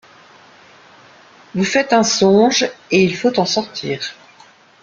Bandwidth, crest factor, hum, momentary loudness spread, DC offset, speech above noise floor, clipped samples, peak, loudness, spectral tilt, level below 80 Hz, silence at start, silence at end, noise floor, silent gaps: 7.6 kHz; 16 dB; none; 12 LU; under 0.1%; 32 dB; under 0.1%; -2 dBFS; -16 LUFS; -4 dB/octave; -58 dBFS; 1.55 s; 0.7 s; -47 dBFS; none